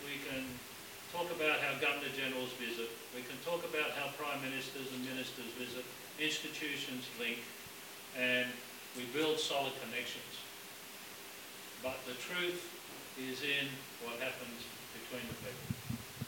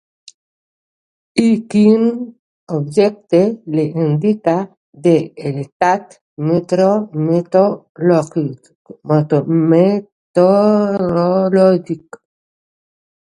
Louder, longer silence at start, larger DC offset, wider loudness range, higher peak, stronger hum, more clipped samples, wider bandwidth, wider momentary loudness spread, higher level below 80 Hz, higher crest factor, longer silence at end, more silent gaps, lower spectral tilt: second, -39 LUFS vs -15 LUFS; second, 0 s vs 1.35 s; neither; about the same, 4 LU vs 3 LU; second, -20 dBFS vs 0 dBFS; neither; neither; first, 17 kHz vs 11 kHz; about the same, 14 LU vs 12 LU; second, -74 dBFS vs -60 dBFS; about the same, 20 dB vs 16 dB; second, 0 s vs 1.25 s; second, none vs 2.39-2.67 s, 4.77-4.93 s, 5.72-5.80 s, 6.21-6.37 s, 7.89-7.95 s, 8.75-8.85 s, 10.12-10.34 s; second, -3 dB/octave vs -8 dB/octave